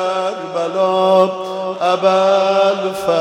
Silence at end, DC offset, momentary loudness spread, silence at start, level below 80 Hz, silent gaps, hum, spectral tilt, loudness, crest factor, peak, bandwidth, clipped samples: 0 s; under 0.1%; 9 LU; 0 s; -64 dBFS; none; none; -5 dB/octave; -15 LUFS; 14 dB; 0 dBFS; 12.5 kHz; under 0.1%